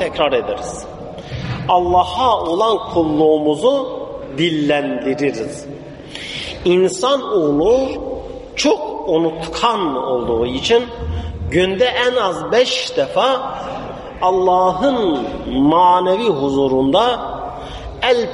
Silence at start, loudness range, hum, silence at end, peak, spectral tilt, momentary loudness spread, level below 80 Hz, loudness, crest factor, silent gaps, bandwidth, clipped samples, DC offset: 0 s; 3 LU; none; 0 s; -2 dBFS; -5 dB/octave; 13 LU; -38 dBFS; -17 LUFS; 14 dB; none; 11.5 kHz; under 0.1%; under 0.1%